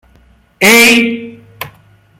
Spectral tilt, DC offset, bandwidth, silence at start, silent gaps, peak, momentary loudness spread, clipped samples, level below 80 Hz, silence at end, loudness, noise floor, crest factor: -2 dB/octave; under 0.1%; over 20 kHz; 0.6 s; none; 0 dBFS; 23 LU; 0.2%; -50 dBFS; 0.5 s; -7 LUFS; -47 dBFS; 12 dB